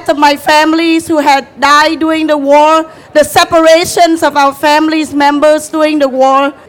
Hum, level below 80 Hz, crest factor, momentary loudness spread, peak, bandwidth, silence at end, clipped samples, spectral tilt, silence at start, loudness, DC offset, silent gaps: none; -46 dBFS; 8 dB; 5 LU; 0 dBFS; 18.5 kHz; 0.15 s; 1%; -3 dB/octave; 0 s; -8 LUFS; under 0.1%; none